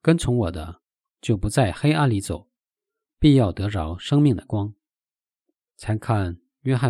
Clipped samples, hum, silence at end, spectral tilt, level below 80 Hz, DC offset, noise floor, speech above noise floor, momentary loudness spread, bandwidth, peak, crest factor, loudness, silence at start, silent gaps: under 0.1%; none; 0 s; -7 dB/octave; -42 dBFS; under 0.1%; under -90 dBFS; over 69 dB; 14 LU; 12.5 kHz; -4 dBFS; 18 dB; -22 LUFS; 0.05 s; none